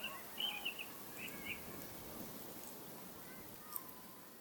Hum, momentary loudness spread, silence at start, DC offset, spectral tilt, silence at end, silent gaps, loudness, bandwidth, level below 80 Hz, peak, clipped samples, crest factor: none; 10 LU; 0 s; under 0.1%; -2 dB/octave; 0 s; none; -46 LUFS; 19 kHz; -72 dBFS; -20 dBFS; under 0.1%; 28 dB